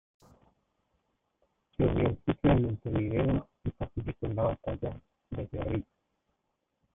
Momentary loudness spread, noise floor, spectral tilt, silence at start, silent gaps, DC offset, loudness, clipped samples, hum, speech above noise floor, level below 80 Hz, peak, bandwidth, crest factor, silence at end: 14 LU; -81 dBFS; -11 dB/octave; 1.8 s; none; under 0.1%; -31 LUFS; under 0.1%; none; 50 dB; -46 dBFS; -12 dBFS; 3.8 kHz; 22 dB; 1.15 s